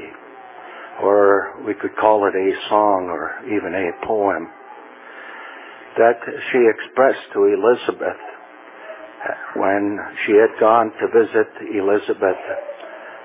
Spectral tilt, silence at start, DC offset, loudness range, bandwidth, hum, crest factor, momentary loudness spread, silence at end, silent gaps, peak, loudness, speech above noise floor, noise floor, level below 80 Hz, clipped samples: -9 dB/octave; 0 s; under 0.1%; 4 LU; 3.9 kHz; none; 18 dB; 21 LU; 0 s; none; 0 dBFS; -18 LUFS; 22 dB; -40 dBFS; -62 dBFS; under 0.1%